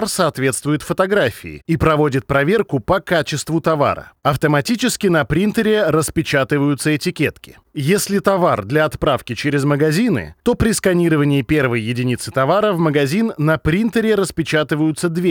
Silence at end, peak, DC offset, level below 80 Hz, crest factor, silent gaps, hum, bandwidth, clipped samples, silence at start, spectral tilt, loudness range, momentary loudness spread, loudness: 0 s; -2 dBFS; under 0.1%; -40 dBFS; 14 dB; none; none; over 20 kHz; under 0.1%; 0 s; -5.5 dB/octave; 1 LU; 5 LU; -17 LUFS